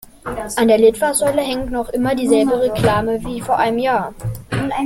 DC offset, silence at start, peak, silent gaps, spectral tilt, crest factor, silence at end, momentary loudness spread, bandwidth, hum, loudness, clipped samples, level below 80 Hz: under 0.1%; 0.25 s; -2 dBFS; none; -5 dB/octave; 16 dB; 0 s; 11 LU; 16.5 kHz; none; -17 LUFS; under 0.1%; -40 dBFS